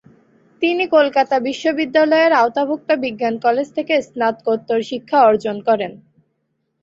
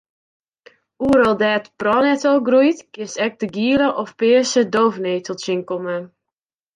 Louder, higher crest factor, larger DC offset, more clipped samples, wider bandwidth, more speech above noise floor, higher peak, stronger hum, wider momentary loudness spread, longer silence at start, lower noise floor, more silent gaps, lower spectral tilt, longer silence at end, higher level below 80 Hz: about the same, -17 LUFS vs -18 LUFS; about the same, 16 dB vs 16 dB; neither; neither; second, 7.8 kHz vs 10.5 kHz; second, 54 dB vs 68 dB; about the same, -2 dBFS vs -4 dBFS; neither; about the same, 8 LU vs 10 LU; second, 0.6 s vs 1 s; second, -70 dBFS vs -85 dBFS; neither; about the same, -5 dB/octave vs -4.5 dB/octave; first, 0.85 s vs 0.7 s; second, -64 dBFS vs -54 dBFS